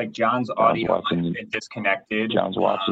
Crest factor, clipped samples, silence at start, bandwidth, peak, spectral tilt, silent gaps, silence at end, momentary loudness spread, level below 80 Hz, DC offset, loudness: 18 dB; under 0.1%; 0 s; 8.2 kHz; -4 dBFS; -6 dB/octave; none; 0 s; 6 LU; -60 dBFS; under 0.1%; -23 LUFS